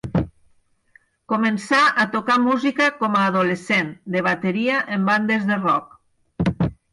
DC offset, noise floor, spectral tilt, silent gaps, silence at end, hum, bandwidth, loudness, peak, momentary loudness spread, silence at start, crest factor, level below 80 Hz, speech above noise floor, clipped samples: under 0.1%; -60 dBFS; -6 dB/octave; none; 0.2 s; none; 11.5 kHz; -20 LUFS; -8 dBFS; 8 LU; 0.05 s; 14 dB; -46 dBFS; 40 dB; under 0.1%